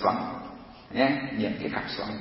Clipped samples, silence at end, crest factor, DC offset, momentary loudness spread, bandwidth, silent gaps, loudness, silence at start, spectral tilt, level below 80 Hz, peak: under 0.1%; 0 s; 20 dB; under 0.1%; 15 LU; 5.8 kHz; none; -29 LUFS; 0 s; -9.5 dB/octave; -58 dBFS; -8 dBFS